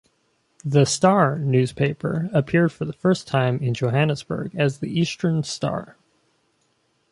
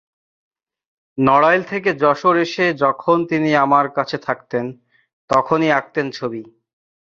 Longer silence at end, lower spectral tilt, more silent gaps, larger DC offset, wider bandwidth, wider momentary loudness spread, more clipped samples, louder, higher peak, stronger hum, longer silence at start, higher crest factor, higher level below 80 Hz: first, 1.2 s vs 0.6 s; about the same, -6 dB/octave vs -6.5 dB/octave; second, none vs 5.13-5.28 s; neither; first, 11.5 kHz vs 7.6 kHz; about the same, 9 LU vs 11 LU; neither; second, -22 LUFS vs -17 LUFS; about the same, -2 dBFS vs 0 dBFS; neither; second, 0.65 s vs 1.15 s; about the same, 20 dB vs 18 dB; about the same, -56 dBFS vs -58 dBFS